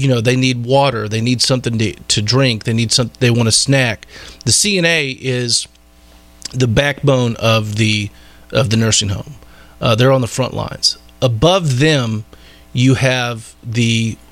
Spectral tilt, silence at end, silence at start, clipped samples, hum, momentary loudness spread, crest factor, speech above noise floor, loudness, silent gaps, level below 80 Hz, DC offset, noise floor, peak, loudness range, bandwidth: -4 dB/octave; 0.15 s; 0 s; under 0.1%; none; 10 LU; 14 dB; 30 dB; -14 LUFS; none; -40 dBFS; under 0.1%; -45 dBFS; 0 dBFS; 2 LU; 14.5 kHz